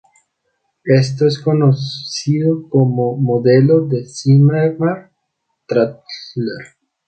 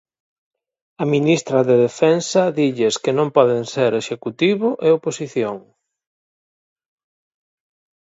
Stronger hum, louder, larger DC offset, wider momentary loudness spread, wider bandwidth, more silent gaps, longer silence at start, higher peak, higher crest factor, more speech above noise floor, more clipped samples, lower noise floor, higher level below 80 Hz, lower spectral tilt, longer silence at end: neither; first, -15 LUFS vs -18 LUFS; neither; first, 13 LU vs 8 LU; about the same, 8.8 kHz vs 8 kHz; neither; second, 0.85 s vs 1 s; about the same, 0 dBFS vs 0 dBFS; about the same, 14 dB vs 18 dB; second, 57 dB vs over 73 dB; neither; second, -71 dBFS vs under -90 dBFS; first, -58 dBFS vs -68 dBFS; first, -7.5 dB/octave vs -5.5 dB/octave; second, 0.45 s vs 2.4 s